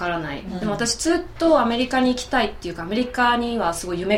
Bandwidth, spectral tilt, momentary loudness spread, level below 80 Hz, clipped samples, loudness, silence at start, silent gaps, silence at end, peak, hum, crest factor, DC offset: 16 kHz; -4 dB/octave; 9 LU; -42 dBFS; under 0.1%; -22 LUFS; 0 s; none; 0 s; -6 dBFS; none; 16 dB; under 0.1%